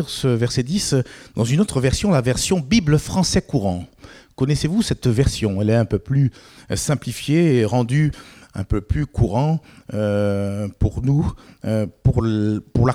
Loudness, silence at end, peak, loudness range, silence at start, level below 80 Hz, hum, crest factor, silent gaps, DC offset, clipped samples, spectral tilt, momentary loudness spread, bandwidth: -20 LUFS; 0 s; -2 dBFS; 3 LU; 0 s; -36 dBFS; none; 18 dB; none; under 0.1%; under 0.1%; -6 dB/octave; 8 LU; 15.5 kHz